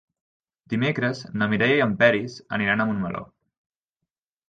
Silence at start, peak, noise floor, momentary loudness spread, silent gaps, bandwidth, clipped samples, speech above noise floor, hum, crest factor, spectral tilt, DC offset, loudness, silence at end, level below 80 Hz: 0.7 s; -6 dBFS; -85 dBFS; 11 LU; none; 7.6 kHz; under 0.1%; 62 dB; none; 20 dB; -6.5 dB/octave; under 0.1%; -23 LUFS; 1.25 s; -58 dBFS